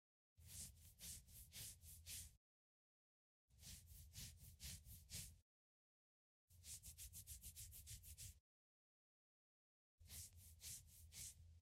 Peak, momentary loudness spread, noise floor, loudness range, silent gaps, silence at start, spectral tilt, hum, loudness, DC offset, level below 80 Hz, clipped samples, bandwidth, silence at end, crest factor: -38 dBFS; 6 LU; under -90 dBFS; 2 LU; 2.37-3.48 s, 5.42-6.48 s, 8.40-9.98 s; 0.35 s; -1.5 dB/octave; none; -58 LUFS; under 0.1%; -70 dBFS; under 0.1%; 16 kHz; 0 s; 24 dB